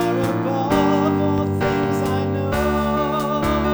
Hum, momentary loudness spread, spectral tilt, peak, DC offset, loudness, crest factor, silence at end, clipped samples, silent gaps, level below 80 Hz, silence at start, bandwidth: none; 3 LU; -7 dB/octave; -6 dBFS; 0.2%; -20 LUFS; 14 dB; 0 s; under 0.1%; none; -36 dBFS; 0 s; over 20 kHz